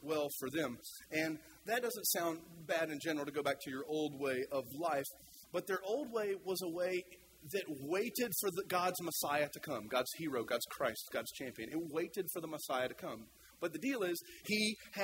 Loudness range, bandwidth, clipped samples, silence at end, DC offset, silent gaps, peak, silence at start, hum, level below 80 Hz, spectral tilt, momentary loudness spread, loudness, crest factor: 3 LU; 16 kHz; under 0.1%; 0 s; under 0.1%; none; -20 dBFS; 0 s; none; -76 dBFS; -3 dB/octave; 8 LU; -39 LUFS; 18 dB